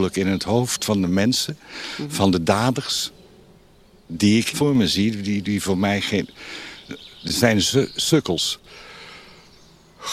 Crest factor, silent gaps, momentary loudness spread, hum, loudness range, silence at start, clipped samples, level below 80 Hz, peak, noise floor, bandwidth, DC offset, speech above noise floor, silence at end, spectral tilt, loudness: 20 dB; none; 17 LU; none; 1 LU; 0 s; under 0.1%; -52 dBFS; -2 dBFS; -52 dBFS; 15 kHz; under 0.1%; 31 dB; 0 s; -4.5 dB/octave; -21 LUFS